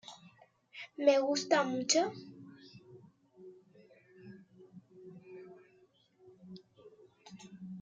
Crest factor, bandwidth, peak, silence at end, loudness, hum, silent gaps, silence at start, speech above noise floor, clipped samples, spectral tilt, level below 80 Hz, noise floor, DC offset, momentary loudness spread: 24 dB; 9.6 kHz; -14 dBFS; 0 s; -31 LUFS; none; none; 0.1 s; 38 dB; under 0.1%; -3 dB/octave; -86 dBFS; -68 dBFS; under 0.1%; 27 LU